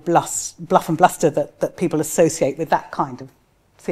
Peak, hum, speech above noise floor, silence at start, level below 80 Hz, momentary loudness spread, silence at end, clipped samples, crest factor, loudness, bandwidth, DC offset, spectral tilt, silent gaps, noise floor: 0 dBFS; none; 33 dB; 0.05 s; -56 dBFS; 10 LU; 0 s; under 0.1%; 20 dB; -20 LUFS; 15.5 kHz; under 0.1%; -5 dB/octave; none; -52 dBFS